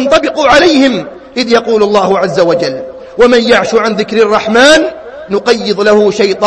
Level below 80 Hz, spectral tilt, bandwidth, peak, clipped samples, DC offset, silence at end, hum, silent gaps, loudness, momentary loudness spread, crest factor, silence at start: -40 dBFS; -4 dB/octave; 11 kHz; 0 dBFS; 1%; under 0.1%; 0 s; none; none; -9 LUFS; 11 LU; 8 dB; 0 s